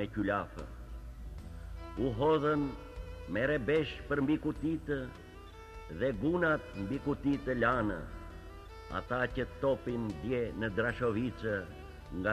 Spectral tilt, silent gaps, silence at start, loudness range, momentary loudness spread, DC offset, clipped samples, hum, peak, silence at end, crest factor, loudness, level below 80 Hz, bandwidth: -7.5 dB/octave; none; 0 s; 2 LU; 18 LU; under 0.1%; under 0.1%; none; -16 dBFS; 0 s; 18 dB; -34 LUFS; -48 dBFS; 13.5 kHz